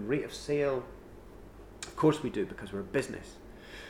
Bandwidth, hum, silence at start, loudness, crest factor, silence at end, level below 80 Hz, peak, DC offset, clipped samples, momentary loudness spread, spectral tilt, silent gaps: 16 kHz; none; 0 s; -33 LUFS; 20 dB; 0 s; -54 dBFS; -14 dBFS; under 0.1%; under 0.1%; 23 LU; -6 dB/octave; none